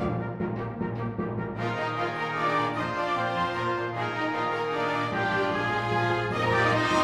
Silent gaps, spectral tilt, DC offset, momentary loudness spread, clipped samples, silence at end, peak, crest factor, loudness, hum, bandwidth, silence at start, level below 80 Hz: none; -6 dB/octave; under 0.1%; 7 LU; under 0.1%; 0 s; -12 dBFS; 16 dB; -28 LUFS; none; 12.5 kHz; 0 s; -54 dBFS